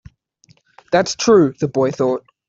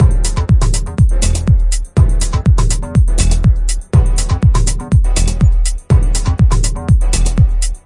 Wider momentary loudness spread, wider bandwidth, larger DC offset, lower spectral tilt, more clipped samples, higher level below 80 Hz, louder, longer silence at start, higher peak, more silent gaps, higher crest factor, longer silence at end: first, 7 LU vs 3 LU; second, 7.8 kHz vs 11.5 kHz; neither; about the same, -5 dB/octave vs -5.5 dB/octave; neither; second, -56 dBFS vs -12 dBFS; about the same, -16 LUFS vs -14 LUFS; first, 0.9 s vs 0 s; about the same, -2 dBFS vs 0 dBFS; neither; first, 16 dB vs 10 dB; first, 0.3 s vs 0.1 s